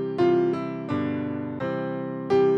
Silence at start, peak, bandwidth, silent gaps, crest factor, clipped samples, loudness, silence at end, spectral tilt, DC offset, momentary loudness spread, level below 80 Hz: 0 s; -10 dBFS; 6.6 kHz; none; 14 dB; under 0.1%; -26 LUFS; 0 s; -8.5 dB/octave; under 0.1%; 9 LU; -64 dBFS